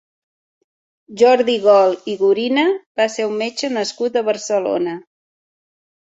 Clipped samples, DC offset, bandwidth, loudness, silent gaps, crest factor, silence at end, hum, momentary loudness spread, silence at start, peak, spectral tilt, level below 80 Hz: under 0.1%; under 0.1%; 8 kHz; -17 LUFS; 2.86-2.95 s; 18 dB; 1.15 s; none; 9 LU; 1.1 s; -2 dBFS; -3.5 dB/octave; -68 dBFS